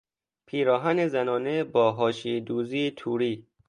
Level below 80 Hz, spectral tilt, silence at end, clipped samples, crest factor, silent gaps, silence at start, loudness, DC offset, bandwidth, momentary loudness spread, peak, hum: -72 dBFS; -6.5 dB/octave; 0.25 s; under 0.1%; 18 dB; none; 0.55 s; -26 LUFS; under 0.1%; 10 kHz; 6 LU; -10 dBFS; none